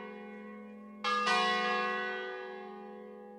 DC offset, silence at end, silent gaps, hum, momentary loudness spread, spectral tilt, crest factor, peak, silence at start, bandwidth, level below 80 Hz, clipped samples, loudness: under 0.1%; 0 s; none; none; 19 LU; -3 dB/octave; 18 dB; -18 dBFS; 0 s; 13 kHz; -84 dBFS; under 0.1%; -32 LUFS